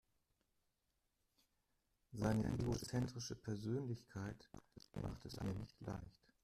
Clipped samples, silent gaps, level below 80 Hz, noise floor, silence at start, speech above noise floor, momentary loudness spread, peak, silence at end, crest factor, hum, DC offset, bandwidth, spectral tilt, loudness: under 0.1%; none; -62 dBFS; -86 dBFS; 2.1 s; 42 dB; 17 LU; -24 dBFS; 0.35 s; 22 dB; none; under 0.1%; 14.5 kHz; -6.5 dB/octave; -45 LUFS